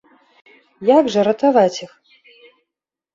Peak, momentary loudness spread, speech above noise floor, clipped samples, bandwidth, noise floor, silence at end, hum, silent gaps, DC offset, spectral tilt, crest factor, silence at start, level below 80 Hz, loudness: -2 dBFS; 7 LU; 70 dB; under 0.1%; 7.6 kHz; -85 dBFS; 1.3 s; none; none; under 0.1%; -5.5 dB/octave; 18 dB; 0.8 s; -66 dBFS; -16 LUFS